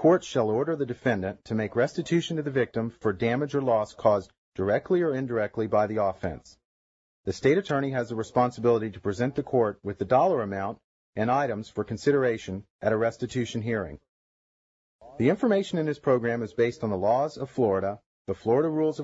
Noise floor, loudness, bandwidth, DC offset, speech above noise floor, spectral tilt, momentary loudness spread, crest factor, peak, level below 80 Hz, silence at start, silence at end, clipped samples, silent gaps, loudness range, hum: under -90 dBFS; -27 LUFS; 8 kHz; under 0.1%; over 64 dB; -7 dB/octave; 9 LU; 18 dB; -10 dBFS; -60 dBFS; 0 s; 0 s; under 0.1%; 4.38-4.52 s, 6.65-7.23 s, 10.84-11.13 s, 12.70-12.79 s, 14.09-14.99 s, 18.06-18.25 s; 3 LU; none